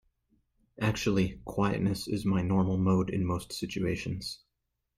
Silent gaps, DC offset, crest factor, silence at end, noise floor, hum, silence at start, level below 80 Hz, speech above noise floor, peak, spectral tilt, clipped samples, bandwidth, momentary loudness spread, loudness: none; under 0.1%; 16 dB; 0.65 s; -83 dBFS; none; 0.8 s; -52 dBFS; 53 dB; -14 dBFS; -6.5 dB/octave; under 0.1%; 14.5 kHz; 9 LU; -30 LUFS